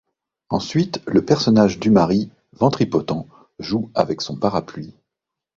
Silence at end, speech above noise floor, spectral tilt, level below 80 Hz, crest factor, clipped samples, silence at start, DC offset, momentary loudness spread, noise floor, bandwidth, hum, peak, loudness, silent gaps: 0.65 s; 65 dB; -6.5 dB/octave; -50 dBFS; 18 dB; under 0.1%; 0.5 s; under 0.1%; 15 LU; -84 dBFS; 7.4 kHz; none; -2 dBFS; -19 LUFS; none